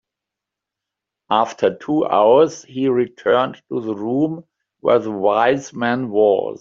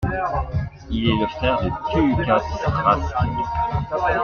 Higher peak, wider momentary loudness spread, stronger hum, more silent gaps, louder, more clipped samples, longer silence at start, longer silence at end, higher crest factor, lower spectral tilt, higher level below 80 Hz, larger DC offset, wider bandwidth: about the same, -2 dBFS vs -2 dBFS; first, 9 LU vs 5 LU; neither; neither; first, -18 LUFS vs -22 LUFS; neither; first, 1.3 s vs 0 s; about the same, 0.05 s vs 0 s; about the same, 16 dB vs 18 dB; second, -6 dB/octave vs -7.5 dB/octave; second, -62 dBFS vs -34 dBFS; neither; first, 7.6 kHz vs 6.8 kHz